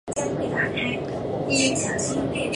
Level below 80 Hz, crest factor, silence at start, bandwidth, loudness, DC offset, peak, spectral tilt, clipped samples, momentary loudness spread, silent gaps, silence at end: -48 dBFS; 16 dB; 0.05 s; 11.5 kHz; -24 LUFS; under 0.1%; -8 dBFS; -3.5 dB/octave; under 0.1%; 7 LU; none; 0 s